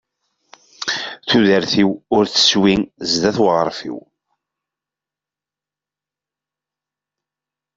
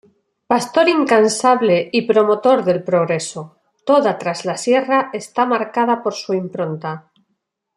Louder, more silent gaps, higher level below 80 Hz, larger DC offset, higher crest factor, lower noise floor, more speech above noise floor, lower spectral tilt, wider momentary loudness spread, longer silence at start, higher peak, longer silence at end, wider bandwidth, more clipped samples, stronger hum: about the same, -16 LUFS vs -17 LUFS; neither; first, -54 dBFS vs -66 dBFS; neither; about the same, 18 dB vs 16 dB; first, -89 dBFS vs -72 dBFS; first, 73 dB vs 56 dB; about the same, -4 dB/octave vs -4.5 dB/octave; first, 13 LU vs 10 LU; first, 0.8 s vs 0.5 s; about the same, -2 dBFS vs 0 dBFS; first, 3.75 s vs 0.75 s; second, 7.8 kHz vs 13 kHz; neither; neither